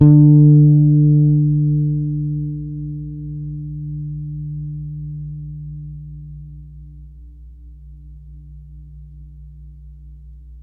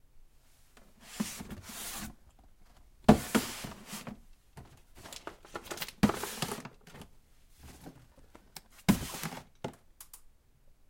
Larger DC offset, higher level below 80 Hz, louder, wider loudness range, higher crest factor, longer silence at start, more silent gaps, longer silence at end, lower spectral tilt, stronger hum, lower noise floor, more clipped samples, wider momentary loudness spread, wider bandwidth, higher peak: neither; first, -38 dBFS vs -54 dBFS; first, -16 LUFS vs -34 LUFS; first, 25 LU vs 5 LU; second, 16 dB vs 30 dB; second, 0 s vs 0.15 s; neither; second, 0 s vs 0.65 s; first, -15.5 dB/octave vs -5 dB/octave; neither; second, -38 dBFS vs -61 dBFS; neither; about the same, 24 LU vs 25 LU; second, 1.1 kHz vs 16.5 kHz; first, 0 dBFS vs -6 dBFS